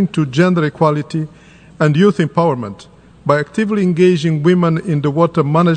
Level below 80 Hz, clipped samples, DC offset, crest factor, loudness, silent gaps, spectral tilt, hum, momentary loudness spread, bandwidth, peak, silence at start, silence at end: -52 dBFS; under 0.1%; under 0.1%; 14 dB; -15 LUFS; none; -7.5 dB/octave; none; 11 LU; 9.2 kHz; 0 dBFS; 0 s; 0 s